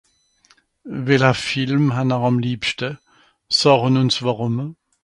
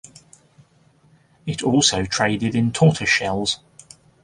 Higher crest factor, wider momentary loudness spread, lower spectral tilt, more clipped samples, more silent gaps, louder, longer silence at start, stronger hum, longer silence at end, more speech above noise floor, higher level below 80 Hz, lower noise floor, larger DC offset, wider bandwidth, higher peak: about the same, 20 dB vs 20 dB; about the same, 13 LU vs 11 LU; first, -5.5 dB/octave vs -4 dB/octave; neither; neither; about the same, -19 LUFS vs -19 LUFS; second, 0.85 s vs 1.45 s; neither; second, 0.3 s vs 0.65 s; about the same, 40 dB vs 37 dB; second, -56 dBFS vs -48 dBFS; about the same, -58 dBFS vs -57 dBFS; neither; about the same, 11.5 kHz vs 11.5 kHz; about the same, 0 dBFS vs -2 dBFS